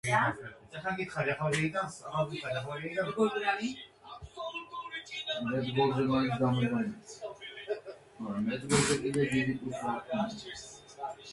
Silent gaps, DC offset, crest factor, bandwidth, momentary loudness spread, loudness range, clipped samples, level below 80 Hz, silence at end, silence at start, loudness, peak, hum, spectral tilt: none; under 0.1%; 18 dB; 11.5 kHz; 15 LU; 3 LU; under 0.1%; -62 dBFS; 0 s; 0.05 s; -33 LUFS; -14 dBFS; none; -5 dB/octave